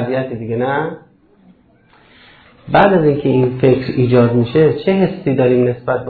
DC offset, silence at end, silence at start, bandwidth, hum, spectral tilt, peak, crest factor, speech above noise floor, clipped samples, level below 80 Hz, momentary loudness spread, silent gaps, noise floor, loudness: under 0.1%; 0 s; 0 s; 4.7 kHz; none; -11 dB/octave; 0 dBFS; 14 dB; 37 dB; under 0.1%; -46 dBFS; 8 LU; none; -50 dBFS; -14 LUFS